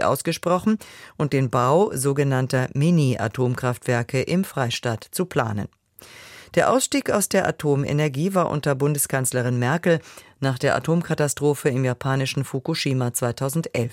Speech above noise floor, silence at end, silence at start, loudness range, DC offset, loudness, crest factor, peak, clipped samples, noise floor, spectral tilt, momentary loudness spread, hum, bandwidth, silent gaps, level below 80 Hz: 24 dB; 0 s; 0 s; 3 LU; under 0.1%; -22 LUFS; 16 dB; -6 dBFS; under 0.1%; -46 dBFS; -5.5 dB/octave; 7 LU; none; 16.5 kHz; none; -56 dBFS